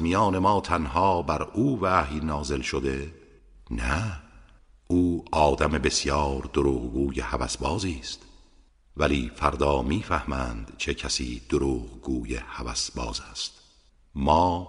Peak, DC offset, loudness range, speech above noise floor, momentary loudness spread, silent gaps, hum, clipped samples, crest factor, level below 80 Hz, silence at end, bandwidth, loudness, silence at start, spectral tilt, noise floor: -4 dBFS; under 0.1%; 4 LU; 33 dB; 11 LU; none; none; under 0.1%; 22 dB; -38 dBFS; 0 s; 10.5 kHz; -26 LUFS; 0 s; -5 dB/octave; -59 dBFS